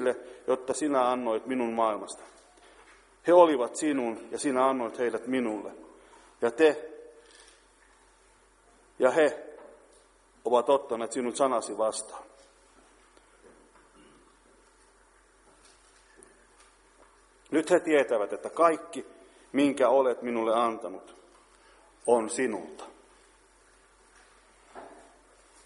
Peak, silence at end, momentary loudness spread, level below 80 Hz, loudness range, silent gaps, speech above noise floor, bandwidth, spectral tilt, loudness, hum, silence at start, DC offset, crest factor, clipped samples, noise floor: -6 dBFS; 0.7 s; 19 LU; -70 dBFS; 7 LU; none; 35 dB; 11.5 kHz; -4 dB/octave; -27 LUFS; none; 0 s; under 0.1%; 24 dB; under 0.1%; -61 dBFS